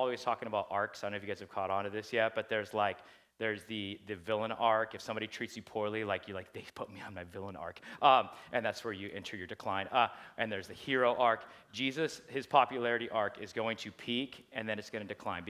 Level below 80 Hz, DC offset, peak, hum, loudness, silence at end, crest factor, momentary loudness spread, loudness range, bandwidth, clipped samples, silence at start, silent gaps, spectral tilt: -68 dBFS; under 0.1%; -12 dBFS; none; -35 LUFS; 0 s; 24 dB; 15 LU; 4 LU; 15 kHz; under 0.1%; 0 s; none; -4.5 dB/octave